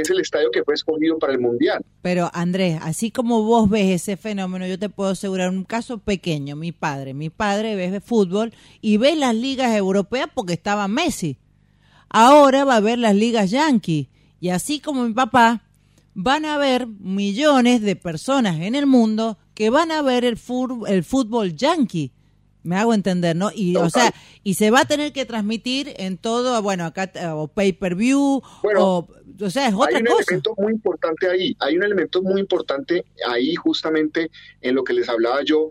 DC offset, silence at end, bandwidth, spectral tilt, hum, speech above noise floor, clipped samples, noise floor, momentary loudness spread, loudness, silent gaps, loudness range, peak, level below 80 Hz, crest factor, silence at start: under 0.1%; 0 s; 15.5 kHz; -5 dB/octave; none; 37 dB; under 0.1%; -56 dBFS; 10 LU; -20 LUFS; none; 5 LU; -4 dBFS; -54 dBFS; 16 dB; 0 s